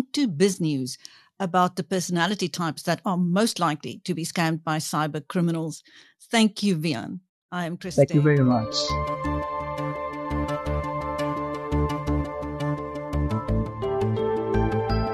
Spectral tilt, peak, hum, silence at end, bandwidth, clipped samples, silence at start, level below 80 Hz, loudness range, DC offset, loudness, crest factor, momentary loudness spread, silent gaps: -5.5 dB/octave; -6 dBFS; none; 0 s; 13 kHz; under 0.1%; 0 s; -38 dBFS; 4 LU; under 0.1%; -25 LUFS; 20 dB; 9 LU; 7.29-7.49 s